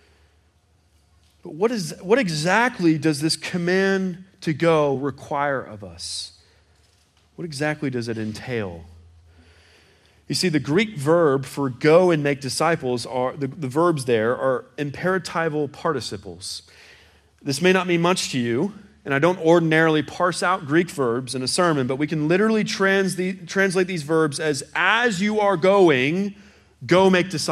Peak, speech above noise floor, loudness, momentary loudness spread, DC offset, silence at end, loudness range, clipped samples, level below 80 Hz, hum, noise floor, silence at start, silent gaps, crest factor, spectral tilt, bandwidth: -4 dBFS; 40 dB; -21 LUFS; 12 LU; under 0.1%; 0 s; 9 LU; under 0.1%; -62 dBFS; none; -61 dBFS; 1.45 s; none; 18 dB; -5 dB/octave; 14.5 kHz